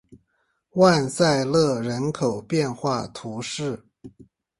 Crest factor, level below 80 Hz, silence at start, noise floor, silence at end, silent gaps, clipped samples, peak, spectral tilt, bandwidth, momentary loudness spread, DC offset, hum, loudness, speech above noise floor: 20 dB; -58 dBFS; 0.1 s; -71 dBFS; 0.5 s; none; under 0.1%; -4 dBFS; -5.5 dB/octave; 11.5 kHz; 14 LU; under 0.1%; none; -23 LUFS; 50 dB